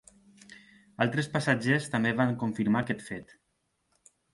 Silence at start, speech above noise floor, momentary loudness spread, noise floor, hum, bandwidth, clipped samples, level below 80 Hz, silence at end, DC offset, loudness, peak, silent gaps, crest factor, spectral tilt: 0.5 s; 48 dB; 9 LU; -76 dBFS; none; 11.5 kHz; under 0.1%; -66 dBFS; 1.1 s; under 0.1%; -28 LUFS; -10 dBFS; none; 22 dB; -6 dB/octave